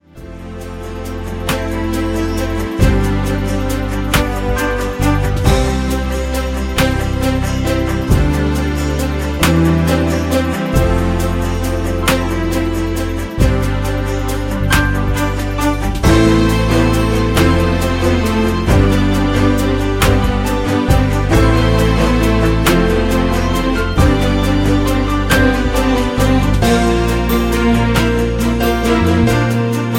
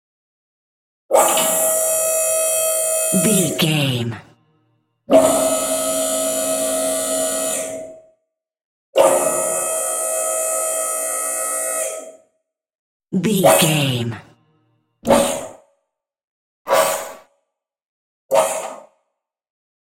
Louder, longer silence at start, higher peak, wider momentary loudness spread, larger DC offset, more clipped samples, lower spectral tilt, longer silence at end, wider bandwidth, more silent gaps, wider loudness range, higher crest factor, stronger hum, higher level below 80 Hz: about the same, -15 LUFS vs -17 LUFS; second, 0.15 s vs 1.1 s; about the same, 0 dBFS vs 0 dBFS; second, 6 LU vs 13 LU; neither; neither; first, -6 dB/octave vs -3 dB/octave; second, 0 s vs 1 s; about the same, 16.5 kHz vs 16.5 kHz; second, none vs 8.64-8.93 s, 12.75-13.00 s, 16.24-16.65 s, 17.88-18.29 s; second, 3 LU vs 6 LU; second, 14 dB vs 20 dB; neither; first, -20 dBFS vs -58 dBFS